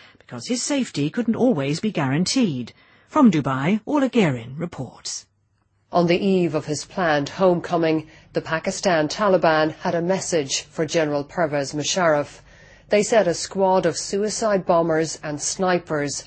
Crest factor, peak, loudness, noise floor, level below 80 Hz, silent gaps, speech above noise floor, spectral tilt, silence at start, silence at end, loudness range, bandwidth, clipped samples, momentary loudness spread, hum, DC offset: 18 dB; -4 dBFS; -21 LUFS; -66 dBFS; -56 dBFS; none; 45 dB; -4.5 dB/octave; 0.3 s; 0.05 s; 2 LU; 8.8 kHz; under 0.1%; 11 LU; none; under 0.1%